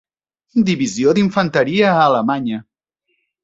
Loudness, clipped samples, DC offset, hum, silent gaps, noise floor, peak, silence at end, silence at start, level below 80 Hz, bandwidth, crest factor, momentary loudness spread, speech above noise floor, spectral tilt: -16 LUFS; under 0.1%; under 0.1%; none; none; -70 dBFS; 0 dBFS; 0.8 s; 0.55 s; -56 dBFS; 8 kHz; 16 dB; 9 LU; 55 dB; -5.5 dB/octave